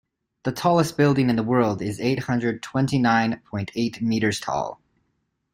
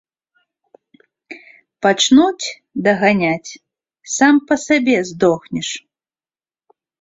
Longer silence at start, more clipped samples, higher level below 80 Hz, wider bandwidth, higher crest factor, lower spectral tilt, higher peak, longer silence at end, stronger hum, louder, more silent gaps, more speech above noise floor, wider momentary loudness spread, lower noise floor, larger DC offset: second, 0.45 s vs 1.3 s; neither; about the same, -56 dBFS vs -58 dBFS; first, 16 kHz vs 8 kHz; about the same, 16 dB vs 16 dB; first, -6 dB/octave vs -4 dB/octave; second, -6 dBFS vs -2 dBFS; second, 0.8 s vs 1.2 s; neither; second, -23 LUFS vs -16 LUFS; neither; second, 51 dB vs over 75 dB; second, 9 LU vs 22 LU; second, -73 dBFS vs under -90 dBFS; neither